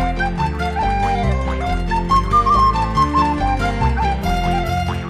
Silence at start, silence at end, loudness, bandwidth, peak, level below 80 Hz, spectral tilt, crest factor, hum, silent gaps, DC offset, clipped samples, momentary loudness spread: 0 s; 0 s; -18 LUFS; 14.5 kHz; -4 dBFS; -24 dBFS; -6.5 dB/octave; 14 dB; none; none; 0.1%; under 0.1%; 6 LU